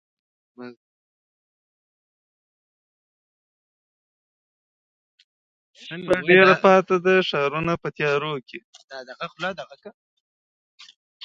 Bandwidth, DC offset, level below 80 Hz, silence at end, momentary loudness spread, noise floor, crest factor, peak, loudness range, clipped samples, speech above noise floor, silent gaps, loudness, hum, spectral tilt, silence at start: 7.6 kHz; under 0.1%; -64 dBFS; 1.35 s; 27 LU; under -90 dBFS; 24 dB; 0 dBFS; 11 LU; under 0.1%; over 69 dB; 0.76-5.18 s, 5.24-5.74 s, 8.64-8.73 s, 8.84-8.88 s; -19 LUFS; none; -6 dB/octave; 0.6 s